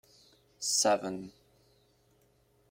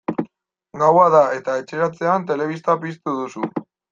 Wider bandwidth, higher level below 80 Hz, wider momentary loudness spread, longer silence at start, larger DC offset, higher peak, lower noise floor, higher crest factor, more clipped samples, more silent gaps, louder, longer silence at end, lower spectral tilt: first, 16.5 kHz vs 7.6 kHz; second, -76 dBFS vs -66 dBFS; first, 18 LU vs 14 LU; first, 0.6 s vs 0.1 s; neither; second, -14 dBFS vs -2 dBFS; first, -68 dBFS vs -54 dBFS; about the same, 22 dB vs 18 dB; neither; neither; second, -30 LUFS vs -19 LUFS; first, 1.4 s vs 0.3 s; second, -1.5 dB/octave vs -7 dB/octave